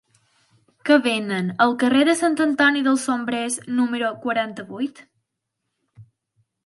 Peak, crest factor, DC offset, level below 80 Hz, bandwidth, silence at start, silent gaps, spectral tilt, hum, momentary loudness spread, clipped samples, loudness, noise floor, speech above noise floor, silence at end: -2 dBFS; 20 dB; under 0.1%; -72 dBFS; 11.5 kHz; 0.85 s; none; -4 dB/octave; none; 12 LU; under 0.1%; -21 LUFS; -79 dBFS; 59 dB; 0.6 s